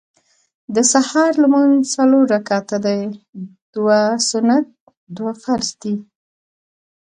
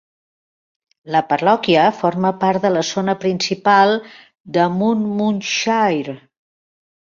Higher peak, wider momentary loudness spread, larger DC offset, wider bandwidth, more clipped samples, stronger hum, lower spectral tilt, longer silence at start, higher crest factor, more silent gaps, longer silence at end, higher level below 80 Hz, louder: about the same, -2 dBFS vs -2 dBFS; first, 16 LU vs 7 LU; neither; first, 10 kHz vs 7.4 kHz; neither; neither; second, -3.5 dB/octave vs -5 dB/octave; second, 0.7 s vs 1.05 s; about the same, 16 dB vs 16 dB; first, 3.29-3.33 s, 3.62-3.73 s, 4.80-4.87 s, 4.97-5.07 s vs 4.40-4.44 s; first, 1.15 s vs 0.85 s; about the same, -64 dBFS vs -62 dBFS; about the same, -16 LUFS vs -17 LUFS